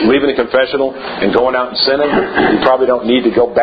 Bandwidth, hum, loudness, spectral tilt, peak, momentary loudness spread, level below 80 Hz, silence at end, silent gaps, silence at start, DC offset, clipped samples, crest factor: 5 kHz; none; -13 LUFS; -8 dB/octave; 0 dBFS; 4 LU; -44 dBFS; 0 s; none; 0 s; under 0.1%; under 0.1%; 12 dB